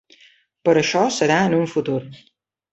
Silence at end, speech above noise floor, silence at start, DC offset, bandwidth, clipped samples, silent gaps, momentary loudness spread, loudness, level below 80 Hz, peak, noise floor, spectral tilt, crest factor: 0.6 s; 36 dB; 0.65 s; under 0.1%; 8.2 kHz; under 0.1%; none; 8 LU; -19 LUFS; -62 dBFS; -4 dBFS; -54 dBFS; -5 dB/octave; 18 dB